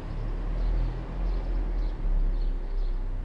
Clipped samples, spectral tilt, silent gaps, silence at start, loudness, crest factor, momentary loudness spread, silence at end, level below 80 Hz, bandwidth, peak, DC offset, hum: under 0.1%; -8.5 dB/octave; none; 0 s; -33 LUFS; 10 dB; 4 LU; 0 s; -28 dBFS; 4.9 kHz; -18 dBFS; under 0.1%; none